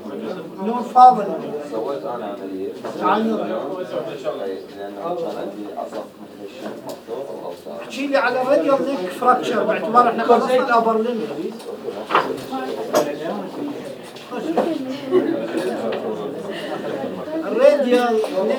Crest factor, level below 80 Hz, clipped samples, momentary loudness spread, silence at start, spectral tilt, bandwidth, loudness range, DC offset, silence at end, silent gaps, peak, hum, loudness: 20 dB; -72 dBFS; under 0.1%; 16 LU; 0 s; -5 dB/octave; over 20 kHz; 10 LU; under 0.1%; 0 s; none; 0 dBFS; none; -20 LUFS